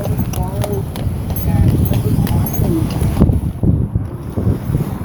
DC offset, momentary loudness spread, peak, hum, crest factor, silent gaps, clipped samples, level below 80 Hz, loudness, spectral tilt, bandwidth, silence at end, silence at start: under 0.1%; 6 LU; 0 dBFS; none; 16 dB; none; under 0.1%; -24 dBFS; -17 LUFS; -7.5 dB/octave; over 20 kHz; 0 s; 0 s